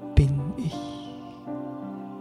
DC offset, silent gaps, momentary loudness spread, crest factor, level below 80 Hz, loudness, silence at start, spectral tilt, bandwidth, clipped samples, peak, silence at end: under 0.1%; none; 16 LU; 22 dB; -32 dBFS; -29 LUFS; 0 s; -8 dB/octave; 10.5 kHz; under 0.1%; -4 dBFS; 0 s